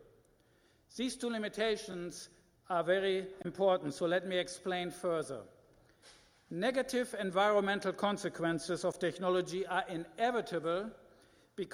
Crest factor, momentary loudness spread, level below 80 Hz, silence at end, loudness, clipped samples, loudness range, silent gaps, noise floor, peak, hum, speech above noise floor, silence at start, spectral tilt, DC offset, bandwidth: 20 dB; 12 LU; -70 dBFS; 0 s; -35 LUFS; under 0.1%; 3 LU; none; -69 dBFS; -16 dBFS; none; 34 dB; 0 s; -4.5 dB/octave; under 0.1%; 15.5 kHz